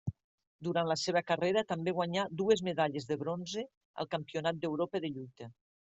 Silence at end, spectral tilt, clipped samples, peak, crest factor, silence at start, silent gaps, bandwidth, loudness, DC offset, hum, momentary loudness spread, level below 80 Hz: 0.45 s; -5 dB/octave; under 0.1%; -14 dBFS; 20 dB; 0.05 s; 0.24-0.38 s, 0.47-0.59 s, 3.77-3.94 s; 8.2 kHz; -34 LUFS; under 0.1%; none; 13 LU; -70 dBFS